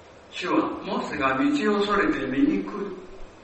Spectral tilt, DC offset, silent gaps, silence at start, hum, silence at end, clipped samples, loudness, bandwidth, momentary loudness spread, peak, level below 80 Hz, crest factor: -5.5 dB/octave; under 0.1%; none; 0 s; none; 0 s; under 0.1%; -25 LUFS; 8.4 kHz; 12 LU; -10 dBFS; -48 dBFS; 16 dB